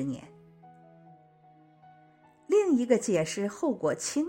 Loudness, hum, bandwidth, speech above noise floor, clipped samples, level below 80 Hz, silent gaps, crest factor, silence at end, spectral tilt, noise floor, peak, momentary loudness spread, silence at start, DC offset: -28 LUFS; none; 16.5 kHz; 31 dB; under 0.1%; -70 dBFS; none; 20 dB; 0 s; -5 dB/octave; -59 dBFS; -10 dBFS; 8 LU; 0 s; under 0.1%